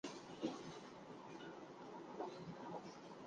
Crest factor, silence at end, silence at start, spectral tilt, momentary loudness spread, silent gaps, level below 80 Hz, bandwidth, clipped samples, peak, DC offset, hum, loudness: 22 dB; 0 s; 0.05 s; -5 dB/octave; 8 LU; none; -82 dBFS; 9.6 kHz; under 0.1%; -30 dBFS; under 0.1%; none; -52 LUFS